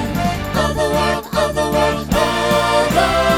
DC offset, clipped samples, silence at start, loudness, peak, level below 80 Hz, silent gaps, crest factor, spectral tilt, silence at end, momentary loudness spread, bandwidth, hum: under 0.1%; under 0.1%; 0 s; -17 LUFS; -2 dBFS; -30 dBFS; none; 14 dB; -4.5 dB/octave; 0 s; 4 LU; over 20 kHz; none